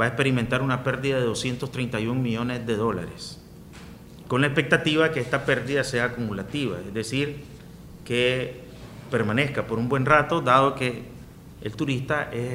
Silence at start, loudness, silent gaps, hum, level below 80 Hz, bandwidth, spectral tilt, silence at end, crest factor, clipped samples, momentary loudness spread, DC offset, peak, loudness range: 0 s; -24 LUFS; none; none; -50 dBFS; 16 kHz; -5.5 dB/octave; 0 s; 24 dB; under 0.1%; 23 LU; under 0.1%; -2 dBFS; 5 LU